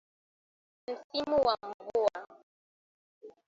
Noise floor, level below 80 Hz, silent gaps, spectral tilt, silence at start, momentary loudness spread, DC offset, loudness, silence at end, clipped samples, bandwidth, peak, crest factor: under -90 dBFS; -68 dBFS; 1.04-1.10 s, 1.74-1.79 s, 2.43-3.21 s; -4.5 dB/octave; 0.9 s; 16 LU; under 0.1%; -32 LUFS; 0.2 s; under 0.1%; 7.8 kHz; -14 dBFS; 20 dB